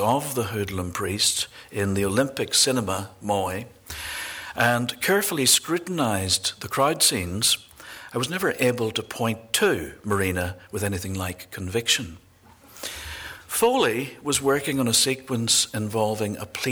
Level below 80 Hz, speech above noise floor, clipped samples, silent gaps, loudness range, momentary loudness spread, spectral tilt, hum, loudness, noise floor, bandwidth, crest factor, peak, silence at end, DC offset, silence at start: -54 dBFS; 28 dB; under 0.1%; none; 5 LU; 13 LU; -3 dB/octave; none; -23 LUFS; -52 dBFS; over 20 kHz; 18 dB; -6 dBFS; 0 s; under 0.1%; 0 s